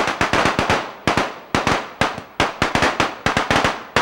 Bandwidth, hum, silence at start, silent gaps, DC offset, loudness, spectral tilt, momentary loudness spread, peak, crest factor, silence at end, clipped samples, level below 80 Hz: 16.5 kHz; none; 0 s; none; under 0.1%; -19 LUFS; -4 dB/octave; 5 LU; -4 dBFS; 16 dB; 0 s; under 0.1%; -40 dBFS